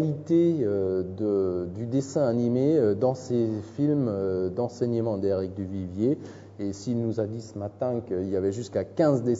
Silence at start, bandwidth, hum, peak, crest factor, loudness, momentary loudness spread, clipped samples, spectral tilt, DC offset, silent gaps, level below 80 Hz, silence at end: 0 s; 7.8 kHz; none; -10 dBFS; 16 dB; -27 LUFS; 10 LU; under 0.1%; -8.5 dB/octave; under 0.1%; none; -64 dBFS; 0 s